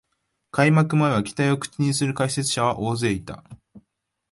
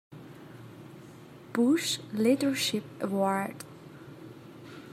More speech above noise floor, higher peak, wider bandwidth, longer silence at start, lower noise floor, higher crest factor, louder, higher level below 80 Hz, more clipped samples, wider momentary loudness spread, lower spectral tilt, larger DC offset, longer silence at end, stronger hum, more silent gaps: first, 53 dB vs 21 dB; first, -6 dBFS vs -14 dBFS; second, 11.5 kHz vs 16 kHz; first, 0.55 s vs 0.1 s; first, -75 dBFS vs -49 dBFS; about the same, 18 dB vs 18 dB; first, -22 LUFS vs -29 LUFS; first, -54 dBFS vs -76 dBFS; neither; second, 11 LU vs 23 LU; first, -5.5 dB/octave vs -4 dB/octave; neither; first, 0.55 s vs 0 s; neither; neither